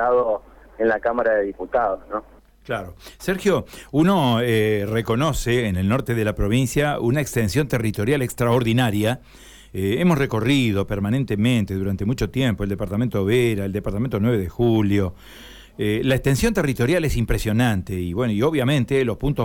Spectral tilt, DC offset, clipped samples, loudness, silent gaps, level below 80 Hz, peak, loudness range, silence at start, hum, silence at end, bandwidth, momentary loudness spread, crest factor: -6.5 dB/octave; under 0.1%; under 0.1%; -21 LUFS; none; -38 dBFS; -8 dBFS; 2 LU; 0 s; none; 0 s; 18 kHz; 8 LU; 12 dB